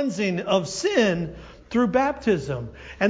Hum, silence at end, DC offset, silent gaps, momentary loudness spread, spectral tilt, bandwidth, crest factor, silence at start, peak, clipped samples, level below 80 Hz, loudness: none; 0 s; under 0.1%; none; 12 LU; -5 dB/octave; 8 kHz; 18 dB; 0 s; -6 dBFS; under 0.1%; -48 dBFS; -23 LUFS